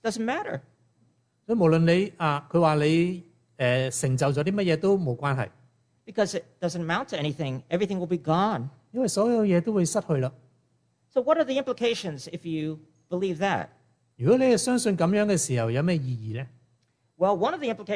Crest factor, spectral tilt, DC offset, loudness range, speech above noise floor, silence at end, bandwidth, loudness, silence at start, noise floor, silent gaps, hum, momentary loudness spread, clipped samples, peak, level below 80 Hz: 16 dB; -5.5 dB/octave; under 0.1%; 4 LU; 44 dB; 0 s; 11 kHz; -26 LUFS; 0.05 s; -69 dBFS; none; none; 11 LU; under 0.1%; -8 dBFS; -64 dBFS